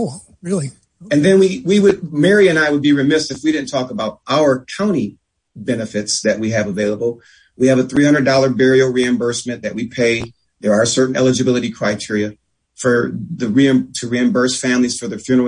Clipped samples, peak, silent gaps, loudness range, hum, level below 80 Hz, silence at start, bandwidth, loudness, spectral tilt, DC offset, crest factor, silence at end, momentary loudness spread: under 0.1%; 0 dBFS; none; 5 LU; none; -54 dBFS; 0 s; 10.5 kHz; -16 LUFS; -5 dB/octave; under 0.1%; 16 dB; 0 s; 11 LU